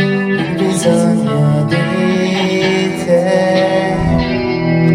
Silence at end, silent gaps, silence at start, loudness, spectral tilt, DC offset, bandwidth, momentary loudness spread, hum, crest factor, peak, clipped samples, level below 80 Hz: 0 s; none; 0 s; -13 LUFS; -6 dB/octave; under 0.1%; 14 kHz; 3 LU; none; 12 dB; 0 dBFS; under 0.1%; -36 dBFS